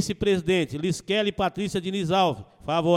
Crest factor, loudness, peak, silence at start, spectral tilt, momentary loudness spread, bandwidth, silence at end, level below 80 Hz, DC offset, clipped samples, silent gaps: 16 dB; -25 LUFS; -8 dBFS; 0 s; -5 dB/octave; 6 LU; 15 kHz; 0 s; -50 dBFS; under 0.1%; under 0.1%; none